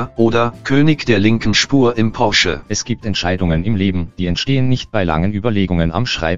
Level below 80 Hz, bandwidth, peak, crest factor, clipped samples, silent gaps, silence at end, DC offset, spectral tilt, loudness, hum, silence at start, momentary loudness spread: -34 dBFS; 7.6 kHz; 0 dBFS; 16 dB; under 0.1%; none; 0 s; 4%; -5 dB/octave; -16 LUFS; none; 0 s; 6 LU